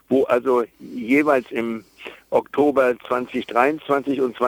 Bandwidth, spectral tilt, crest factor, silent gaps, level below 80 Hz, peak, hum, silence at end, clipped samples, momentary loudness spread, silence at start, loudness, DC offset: 19.5 kHz; -6 dB/octave; 18 dB; none; -62 dBFS; -2 dBFS; none; 0 s; under 0.1%; 13 LU; 0.1 s; -21 LUFS; under 0.1%